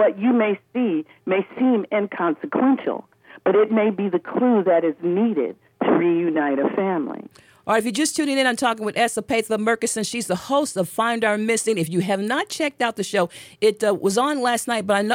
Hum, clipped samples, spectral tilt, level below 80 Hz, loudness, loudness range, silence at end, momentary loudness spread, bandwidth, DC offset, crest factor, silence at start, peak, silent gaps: none; under 0.1%; -4.5 dB/octave; -68 dBFS; -21 LUFS; 2 LU; 0 s; 6 LU; 16.5 kHz; under 0.1%; 16 dB; 0 s; -6 dBFS; none